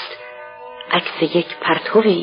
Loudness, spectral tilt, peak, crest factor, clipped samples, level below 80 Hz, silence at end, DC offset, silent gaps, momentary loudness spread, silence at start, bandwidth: -18 LUFS; -3 dB/octave; -2 dBFS; 18 dB; under 0.1%; -70 dBFS; 0 s; under 0.1%; none; 20 LU; 0 s; 5.4 kHz